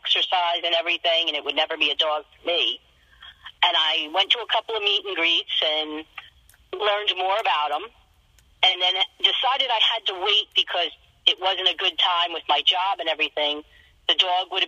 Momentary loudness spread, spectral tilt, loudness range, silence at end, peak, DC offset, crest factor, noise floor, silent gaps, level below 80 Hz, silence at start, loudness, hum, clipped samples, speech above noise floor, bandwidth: 7 LU; -0.5 dB/octave; 3 LU; 0 s; -2 dBFS; under 0.1%; 22 dB; -58 dBFS; none; -64 dBFS; 0.05 s; -21 LUFS; none; under 0.1%; 35 dB; 14.5 kHz